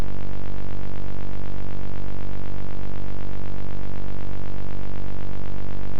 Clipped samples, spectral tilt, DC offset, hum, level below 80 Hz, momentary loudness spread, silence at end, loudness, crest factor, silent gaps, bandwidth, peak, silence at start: under 0.1%; -8 dB/octave; 30%; none; -36 dBFS; 0 LU; 0 s; -35 LUFS; 10 dB; none; 8 kHz; -10 dBFS; 0 s